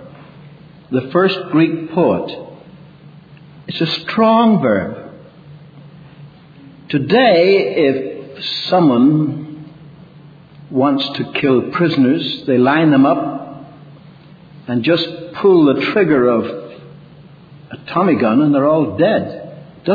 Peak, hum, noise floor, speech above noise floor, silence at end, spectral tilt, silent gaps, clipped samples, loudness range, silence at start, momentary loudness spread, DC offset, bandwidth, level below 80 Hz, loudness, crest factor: 0 dBFS; none; -41 dBFS; 27 dB; 0 s; -8.5 dB/octave; none; under 0.1%; 3 LU; 0 s; 17 LU; under 0.1%; 5 kHz; -58 dBFS; -14 LUFS; 16 dB